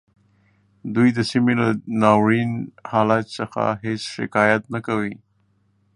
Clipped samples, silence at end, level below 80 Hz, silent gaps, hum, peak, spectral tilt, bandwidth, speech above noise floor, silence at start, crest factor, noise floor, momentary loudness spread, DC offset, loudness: under 0.1%; 0.8 s; -58 dBFS; none; none; 0 dBFS; -6.5 dB/octave; 11 kHz; 44 dB; 0.85 s; 20 dB; -64 dBFS; 10 LU; under 0.1%; -20 LUFS